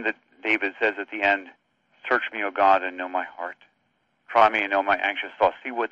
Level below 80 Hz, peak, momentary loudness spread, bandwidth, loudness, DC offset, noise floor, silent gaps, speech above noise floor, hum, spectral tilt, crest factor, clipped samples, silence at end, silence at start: -64 dBFS; -4 dBFS; 11 LU; 7.6 kHz; -23 LUFS; under 0.1%; -71 dBFS; none; 47 dB; none; -4.5 dB/octave; 20 dB; under 0.1%; 0.05 s; 0 s